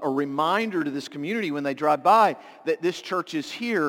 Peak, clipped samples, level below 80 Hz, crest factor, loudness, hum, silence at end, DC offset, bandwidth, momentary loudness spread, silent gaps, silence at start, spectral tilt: -6 dBFS; under 0.1%; -78 dBFS; 18 dB; -24 LUFS; none; 0 s; under 0.1%; 17 kHz; 11 LU; none; 0 s; -5 dB/octave